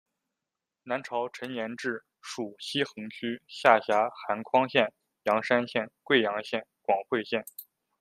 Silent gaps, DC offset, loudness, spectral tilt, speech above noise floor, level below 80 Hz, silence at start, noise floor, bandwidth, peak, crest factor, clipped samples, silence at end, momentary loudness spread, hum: none; under 0.1%; -29 LUFS; -4.5 dB/octave; 59 dB; -78 dBFS; 0.85 s; -88 dBFS; 15.5 kHz; -4 dBFS; 26 dB; under 0.1%; 0.35 s; 12 LU; none